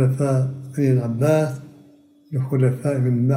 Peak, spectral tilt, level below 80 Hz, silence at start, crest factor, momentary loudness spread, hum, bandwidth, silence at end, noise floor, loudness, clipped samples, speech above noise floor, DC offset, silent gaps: -6 dBFS; -8.5 dB/octave; -64 dBFS; 0 s; 16 dB; 8 LU; none; 15 kHz; 0 s; -51 dBFS; -21 LUFS; under 0.1%; 32 dB; under 0.1%; none